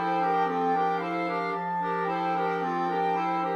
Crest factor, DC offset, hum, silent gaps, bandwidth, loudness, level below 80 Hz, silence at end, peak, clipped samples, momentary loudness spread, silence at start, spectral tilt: 12 dB; under 0.1%; none; none; 8 kHz; -27 LUFS; -78 dBFS; 0 s; -16 dBFS; under 0.1%; 3 LU; 0 s; -7 dB/octave